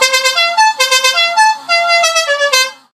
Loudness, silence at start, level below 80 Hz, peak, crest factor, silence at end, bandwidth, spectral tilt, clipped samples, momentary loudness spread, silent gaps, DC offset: -10 LUFS; 0 s; -70 dBFS; 0 dBFS; 12 dB; 0.2 s; 16 kHz; 4 dB/octave; under 0.1%; 3 LU; none; under 0.1%